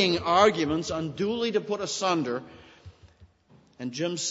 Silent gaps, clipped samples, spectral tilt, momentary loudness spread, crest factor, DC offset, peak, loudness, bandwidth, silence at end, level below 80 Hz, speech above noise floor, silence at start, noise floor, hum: none; under 0.1%; -4 dB/octave; 12 LU; 22 dB; under 0.1%; -6 dBFS; -26 LUFS; 8 kHz; 0 s; -58 dBFS; 33 dB; 0 s; -59 dBFS; none